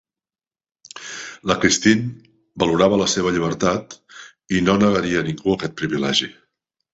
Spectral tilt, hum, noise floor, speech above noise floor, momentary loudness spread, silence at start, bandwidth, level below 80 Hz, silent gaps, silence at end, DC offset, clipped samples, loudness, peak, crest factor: -4 dB/octave; none; under -90 dBFS; over 71 dB; 17 LU; 0.95 s; 8.2 kHz; -48 dBFS; none; 0.6 s; under 0.1%; under 0.1%; -19 LUFS; -2 dBFS; 20 dB